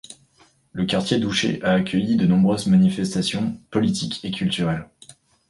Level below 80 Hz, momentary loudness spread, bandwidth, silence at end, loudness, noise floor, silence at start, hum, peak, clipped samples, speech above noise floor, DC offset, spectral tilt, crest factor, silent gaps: -52 dBFS; 9 LU; 11.5 kHz; 0.65 s; -21 LUFS; -58 dBFS; 0.1 s; none; -6 dBFS; under 0.1%; 38 dB; under 0.1%; -5.5 dB/octave; 16 dB; none